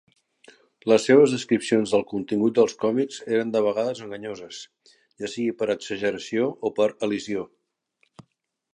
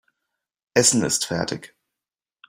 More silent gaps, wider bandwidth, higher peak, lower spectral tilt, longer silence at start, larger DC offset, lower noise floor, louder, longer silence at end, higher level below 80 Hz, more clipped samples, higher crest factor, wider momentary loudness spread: neither; second, 11 kHz vs 16 kHz; about the same, -4 dBFS vs -2 dBFS; first, -5 dB/octave vs -3 dB/octave; about the same, 0.85 s vs 0.75 s; neither; second, -72 dBFS vs -89 dBFS; second, -23 LUFS vs -20 LUFS; second, 0.55 s vs 0.85 s; second, -68 dBFS vs -60 dBFS; neither; about the same, 20 dB vs 22 dB; first, 16 LU vs 12 LU